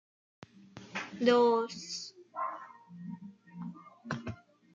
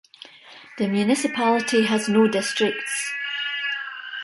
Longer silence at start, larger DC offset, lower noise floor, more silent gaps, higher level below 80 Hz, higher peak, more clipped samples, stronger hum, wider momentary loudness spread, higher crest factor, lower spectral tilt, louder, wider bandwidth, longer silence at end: first, 0.75 s vs 0.2 s; neither; first, -53 dBFS vs -46 dBFS; neither; about the same, -74 dBFS vs -70 dBFS; second, -14 dBFS vs -6 dBFS; neither; neither; first, 25 LU vs 10 LU; about the same, 22 dB vs 18 dB; first, -5 dB/octave vs -3.5 dB/octave; second, -32 LUFS vs -22 LUFS; second, 7.6 kHz vs 11.5 kHz; first, 0.4 s vs 0 s